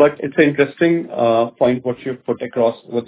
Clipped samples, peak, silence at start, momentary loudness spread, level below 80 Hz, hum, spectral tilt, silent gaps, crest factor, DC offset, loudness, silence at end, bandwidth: under 0.1%; 0 dBFS; 0 s; 9 LU; -58 dBFS; none; -10.5 dB/octave; none; 16 dB; under 0.1%; -17 LUFS; 0.05 s; 4 kHz